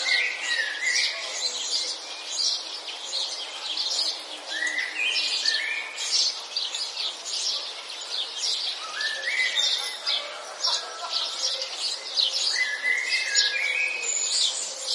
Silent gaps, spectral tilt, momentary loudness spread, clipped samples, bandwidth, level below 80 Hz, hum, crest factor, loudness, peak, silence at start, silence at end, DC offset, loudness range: none; 4.5 dB/octave; 7 LU; under 0.1%; 11.5 kHz; under -90 dBFS; none; 22 dB; -25 LUFS; -6 dBFS; 0 s; 0 s; under 0.1%; 3 LU